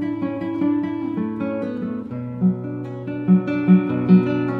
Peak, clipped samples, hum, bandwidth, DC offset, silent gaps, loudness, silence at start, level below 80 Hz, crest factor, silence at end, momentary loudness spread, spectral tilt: -2 dBFS; under 0.1%; none; 4.5 kHz; under 0.1%; none; -21 LUFS; 0 s; -60 dBFS; 18 dB; 0 s; 13 LU; -11 dB/octave